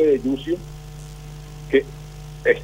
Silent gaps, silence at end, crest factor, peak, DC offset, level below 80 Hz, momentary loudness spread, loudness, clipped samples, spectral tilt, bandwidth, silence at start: none; 0 s; 18 dB; -4 dBFS; under 0.1%; -42 dBFS; 17 LU; -22 LUFS; under 0.1%; -6.5 dB/octave; 16 kHz; 0 s